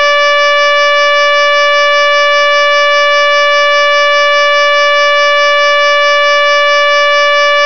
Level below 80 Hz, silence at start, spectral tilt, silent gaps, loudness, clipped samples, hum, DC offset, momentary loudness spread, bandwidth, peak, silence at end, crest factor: -64 dBFS; 0 s; 1.5 dB/octave; none; -7 LUFS; 9%; none; 5%; 0 LU; 5.4 kHz; 0 dBFS; 0 s; 8 dB